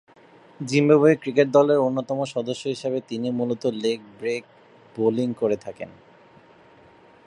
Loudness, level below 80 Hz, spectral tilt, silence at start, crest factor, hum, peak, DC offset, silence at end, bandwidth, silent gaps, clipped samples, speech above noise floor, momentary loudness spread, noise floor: -23 LUFS; -70 dBFS; -6.5 dB/octave; 0.6 s; 20 dB; none; -4 dBFS; under 0.1%; 1.35 s; 11 kHz; none; under 0.1%; 30 dB; 14 LU; -52 dBFS